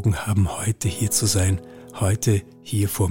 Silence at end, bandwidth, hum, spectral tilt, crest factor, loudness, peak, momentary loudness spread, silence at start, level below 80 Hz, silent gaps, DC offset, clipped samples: 0 s; 17 kHz; none; -5 dB/octave; 16 dB; -22 LUFS; -6 dBFS; 7 LU; 0 s; -42 dBFS; none; under 0.1%; under 0.1%